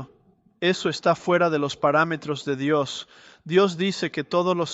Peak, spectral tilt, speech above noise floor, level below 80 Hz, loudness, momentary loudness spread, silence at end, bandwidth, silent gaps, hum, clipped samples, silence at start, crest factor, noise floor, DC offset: -6 dBFS; -5.5 dB/octave; 36 dB; -66 dBFS; -23 LUFS; 7 LU; 0 s; 8.2 kHz; none; none; under 0.1%; 0 s; 18 dB; -59 dBFS; under 0.1%